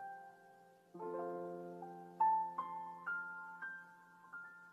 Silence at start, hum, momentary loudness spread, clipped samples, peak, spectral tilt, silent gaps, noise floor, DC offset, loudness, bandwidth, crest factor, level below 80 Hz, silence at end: 0 s; none; 24 LU; under 0.1%; -24 dBFS; -7 dB/octave; none; -65 dBFS; under 0.1%; -43 LUFS; 12 kHz; 20 dB; under -90 dBFS; 0 s